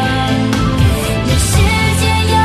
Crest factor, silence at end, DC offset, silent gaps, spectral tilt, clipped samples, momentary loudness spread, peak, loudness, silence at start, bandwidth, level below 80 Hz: 12 dB; 0 s; under 0.1%; none; -5 dB/octave; under 0.1%; 3 LU; -2 dBFS; -13 LUFS; 0 s; 14 kHz; -22 dBFS